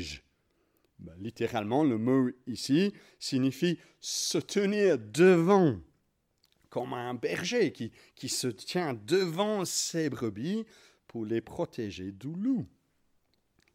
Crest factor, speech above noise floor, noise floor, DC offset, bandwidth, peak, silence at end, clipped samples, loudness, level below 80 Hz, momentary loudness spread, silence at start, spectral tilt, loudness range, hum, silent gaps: 20 dB; 45 dB; -75 dBFS; under 0.1%; 16.5 kHz; -10 dBFS; 1.1 s; under 0.1%; -30 LUFS; -66 dBFS; 16 LU; 0 s; -5 dB/octave; 7 LU; none; none